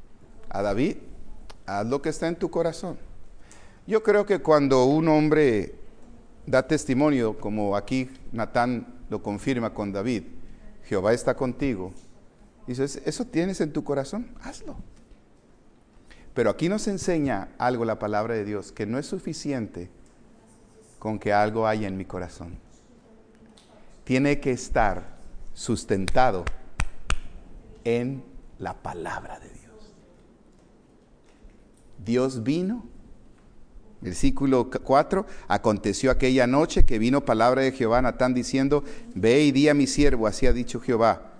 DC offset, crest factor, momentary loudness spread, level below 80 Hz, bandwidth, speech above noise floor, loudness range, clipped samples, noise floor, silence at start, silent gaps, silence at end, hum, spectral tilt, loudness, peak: under 0.1%; 22 dB; 16 LU; -36 dBFS; 10.5 kHz; 32 dB; 10 LU; under 0.1%; -55 dBFS; 0 s; none; 0 s; none; -6 dB/octave; -25 LUFS; -4 dBFS